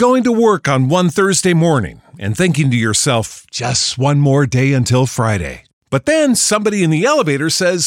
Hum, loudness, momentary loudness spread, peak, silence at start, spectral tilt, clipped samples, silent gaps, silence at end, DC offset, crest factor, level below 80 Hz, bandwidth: none; -14 LUFS; 8 LU; -2 dBFS; 0 s; -4.5 dB/octave; under 0.1%; 5.73-5.81 s; 0 s; under 0.1%; 12 dB; -44 dBFS; 16.5 kHz